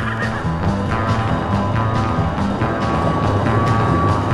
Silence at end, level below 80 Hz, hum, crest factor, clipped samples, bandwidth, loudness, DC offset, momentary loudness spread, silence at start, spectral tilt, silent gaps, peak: 0 s; -32 dBFS; none; 14 dB; under 0.1%; 11 kHz; -18 LUFS; under 0.1%; 4 LU; 0 s; -7.5 dB/octave; none; -4 dBFS